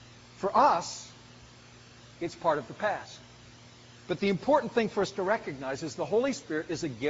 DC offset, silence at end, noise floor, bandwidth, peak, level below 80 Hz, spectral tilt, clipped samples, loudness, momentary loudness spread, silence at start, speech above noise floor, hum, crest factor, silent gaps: under 0.1%; 0 s; -53 dBFS; 8 kHz; -10 dBFS; -64 dBFS; -4 dB/octave; under 0.1%; -30 LUFS; 14 LU; 0 s; 24 dB; none; 20 dB; none